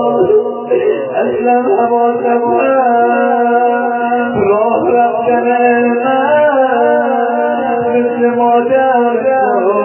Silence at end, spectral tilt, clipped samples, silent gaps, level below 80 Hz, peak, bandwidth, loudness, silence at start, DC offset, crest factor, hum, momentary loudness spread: 0 s; -9.5 dB/octave; under 0.1%; none; -54 dBFS; 0 dBFS; 3.2 kHz; -12 LUFS; 0 s; under 0.1%; 10 dB; none; 4 LU